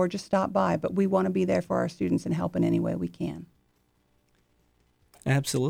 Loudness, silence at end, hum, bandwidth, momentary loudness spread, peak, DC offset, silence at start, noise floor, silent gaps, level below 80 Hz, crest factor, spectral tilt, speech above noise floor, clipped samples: -27 LUFS; 0 s; 60 Hz at -60 dBFS; 16.5 kHz; 9 LU; -12 dBFS; under 0.1%; 0 s; -69 dBFS; none; -58 dBFS; 16 dB; -6.5 dB/octave; 42 dB; under 0.1%